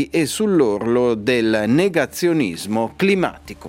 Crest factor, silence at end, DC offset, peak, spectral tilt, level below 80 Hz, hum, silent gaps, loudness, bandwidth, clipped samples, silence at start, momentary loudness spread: 16 dB; 0 s; under 0.1%; -2 dBFS; -5.5 dB/octave; -52 dBFS; none; none; -18 LUFS; 16.5 kHz; under 0.1%; 0 s; 5 LU